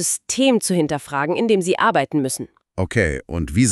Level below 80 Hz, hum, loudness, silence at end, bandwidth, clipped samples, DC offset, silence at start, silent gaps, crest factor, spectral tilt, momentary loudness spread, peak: -40 dBFS; none; -20 LUFS; 0 s; 14 kHz; under 0.1%; under 0.1%; 0 s; none; 16 dB; -4.5 dB/octave; 9 LU; -4 dBFS